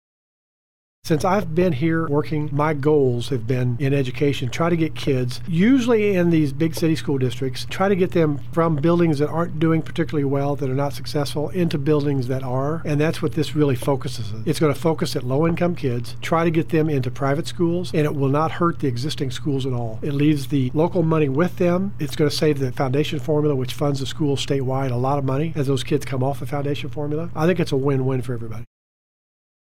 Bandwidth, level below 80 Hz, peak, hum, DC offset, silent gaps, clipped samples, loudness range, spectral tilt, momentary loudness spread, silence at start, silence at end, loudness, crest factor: 16 kHz; -46 dBFS; -6 dBFS; none; 3%; none; under 0.1%; 3 LU; -7 dB/octave; 7 LU; 1 s; 1 s; -21 LUFS; 16 dB